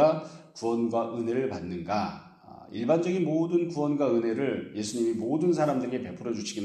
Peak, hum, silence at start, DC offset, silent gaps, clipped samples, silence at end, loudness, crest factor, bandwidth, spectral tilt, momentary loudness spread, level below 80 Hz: -10 dBFS; none; 0 s; under 0.1%; none; under 0.1%; 0 s; -28 LUFS; 18 dB; 10.5 kHz; -6.5 dB/octave; 9 LU; -68 dBFS